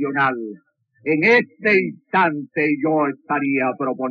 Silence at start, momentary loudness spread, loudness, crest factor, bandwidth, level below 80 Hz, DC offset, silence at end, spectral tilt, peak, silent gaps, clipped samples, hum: 0 s; 8 LU; -19 LUFS; 16 dB; 6.6 kHz; under -90 dBFS; under 0.1%; 0 s; -4 dB/octave; -4 dBFS; none; under 0.1%; none